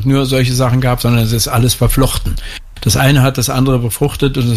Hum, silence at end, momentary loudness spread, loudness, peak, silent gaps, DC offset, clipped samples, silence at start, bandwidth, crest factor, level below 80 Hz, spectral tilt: none; 0 s; 9 LU; -13 LUFS; 0 dBFS; none; under 0.1%; under 0.1%; 0 s; 15.5 kHz; 12 dB; -24 dBFS; -5 dB/octave